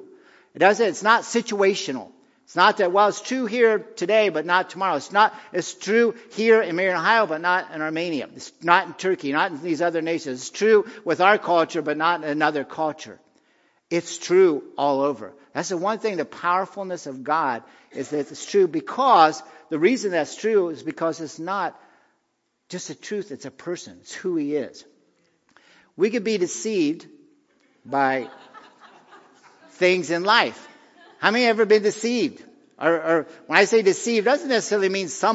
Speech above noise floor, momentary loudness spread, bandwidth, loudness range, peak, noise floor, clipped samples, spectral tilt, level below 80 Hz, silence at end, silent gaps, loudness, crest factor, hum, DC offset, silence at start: 51 dB; 13 LU; 8 kHz; 8 LU; 0 dBFS; -73 dBFS; under 0.1%; -3.5 dB/octave; -80 dBFS; 0 s; none; -22 LUFS; 22 dB; none; under 0.1%; 0 s